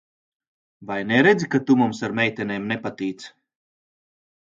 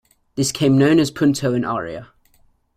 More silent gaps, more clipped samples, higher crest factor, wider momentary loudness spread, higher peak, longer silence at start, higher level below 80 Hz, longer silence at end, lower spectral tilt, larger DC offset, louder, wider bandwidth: neither; neither; about the same, 20 dB vs 16 dB; second, 14 LU vs 17 LU; about the same, -4 dBFS vs -2 dBFS; first, 0.8 s vs 0.35 s; second, -64 dBFS vs -52 dBFS; first, 1.15 s vs 0.75 s; about the same, -6 dB/octave vs -5.5 dB/octave; neither; second, -21 LUFS vs -18 LUFS; second, 7.8 kHz vs 15.5 kHz